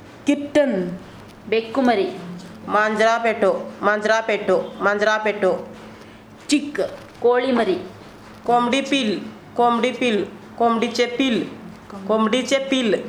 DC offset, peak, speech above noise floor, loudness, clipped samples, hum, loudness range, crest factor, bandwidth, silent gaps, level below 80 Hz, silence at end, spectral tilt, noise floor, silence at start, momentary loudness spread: under 0.1%; -4 dBFS; 23 dB; -20 LUFS; under 0.1%; none; 2 LU; 18 dB; 13.5 kHz; none; -58 dBFS; 0 s; -4.5 dB/octave; -42 dBFS; 0 s; 17 LU